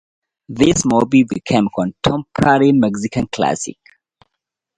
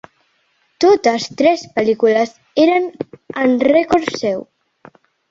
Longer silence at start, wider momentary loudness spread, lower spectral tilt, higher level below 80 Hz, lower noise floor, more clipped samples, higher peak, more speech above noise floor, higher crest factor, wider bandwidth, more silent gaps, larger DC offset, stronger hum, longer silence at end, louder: second, 0.5 s vs 0.8 s; about the same, 9 LU vs 10 LU; about the same, -5 dB/octave vs -4.5 dB/octave; first, -44 dBFS vs -56 dBFS; first, -79 dBFS vs -62 dBFS; neither; about the same, 0 dBFS vs -2 dBFS; first, 64 dB vs 47 dB; about the same, 16 dB vs 14 dB; first, 11 kHz vs 7.8 kHz; neither; neither; neither; first, 1.05 s vs 0.85 s; about the same, -16 LUFS vs -16 LUFS